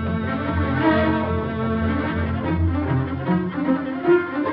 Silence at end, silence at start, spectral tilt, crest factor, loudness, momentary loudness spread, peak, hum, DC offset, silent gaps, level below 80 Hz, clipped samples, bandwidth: 0 s; 0 s; -6.5 dB/octave; 14 dB; -22 LUFS; 5 LU; -6 dBFS; none; under 0.1%; none; -36 dBFS; under 0.1%; 5.2 kHz